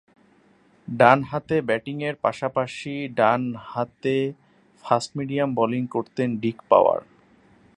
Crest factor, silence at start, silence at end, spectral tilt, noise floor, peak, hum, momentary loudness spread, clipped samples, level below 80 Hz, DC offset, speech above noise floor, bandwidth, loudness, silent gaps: 22 dB; 0.9 s; 0.75 s; -6.5 dB/octave; -58 dBFS; 0 dBFS; none; 12 LU; under 0.1%; -64 dBFS; under 0.1%; 36 dB; 11 kHz; -23 LUFS; none